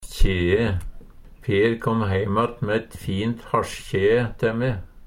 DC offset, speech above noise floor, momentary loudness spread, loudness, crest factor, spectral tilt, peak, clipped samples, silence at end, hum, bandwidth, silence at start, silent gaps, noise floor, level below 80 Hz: under 0.1%; 20 dB; 7 LU; -23 LUFS; 18 dB; -6.5 dB/octave; -4 dBFS; under 0.1%; 0 s; none; 15.5 kHz; 0 s; none; -42 dBFS; -30 dBFS